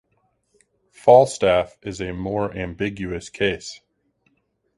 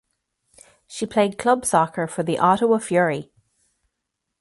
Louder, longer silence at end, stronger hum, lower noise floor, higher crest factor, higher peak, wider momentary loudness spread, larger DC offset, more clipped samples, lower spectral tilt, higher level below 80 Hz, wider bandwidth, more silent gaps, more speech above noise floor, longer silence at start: about the same, -21 LUFS vs -21 LUFS; second, 1 s vs 1.2 s; neither; second, -68 dBFS vs -80 dBFS; about the same, 22 dB vs 20 dB; about the same, 0 dBFS vs -2 dBFS; first, 17 LU vs 10 LU; neither; neither; about the same, -5 dB/octave vs -5 dB/octave; first, -48 dBFS vs -62 dBFS; about the same, 11.5 kHz vs 12 kHz; neither; second, 48 dB vs 60 dB; first, 1.05 s vs 0.9 s